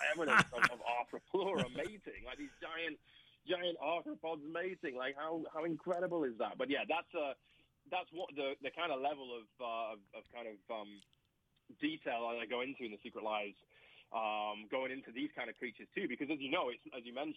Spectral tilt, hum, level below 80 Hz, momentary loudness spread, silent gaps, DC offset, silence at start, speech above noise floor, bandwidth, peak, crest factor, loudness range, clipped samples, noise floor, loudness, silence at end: -4.5 dB/octave; none; -72 dBFS; 11 LU; none; under 0.1%; 0 s; 39 dB; 16 kHz; -16 dBFS; 24 dB; 4 LU; under 0.1%; -79 dBFS; -40 LUFS; 0 s